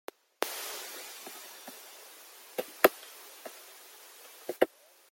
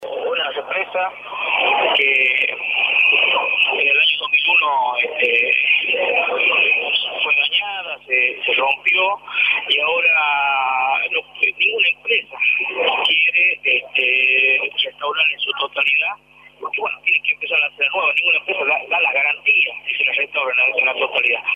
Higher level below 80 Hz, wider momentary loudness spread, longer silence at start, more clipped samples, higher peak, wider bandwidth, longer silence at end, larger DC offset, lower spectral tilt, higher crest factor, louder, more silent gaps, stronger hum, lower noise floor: second, -76 dBFS vs -68 dBFS; first, 23 LU vs 7 LU; first, 0.4 s vs 0 s; neither; about the same, -2 dBFS vs -4 dBFS; first, 17 kHz vs 8.4 kHz; first, 0.45 s vs 0 s; neither; about the same, -1.5 dB/octave vs -2 dB/octave; first, 34 dB vs 14 dB; second, -33 LUFS vs -16 LUFS; neither; neither; first, -53 dBFS vs -43 dBFS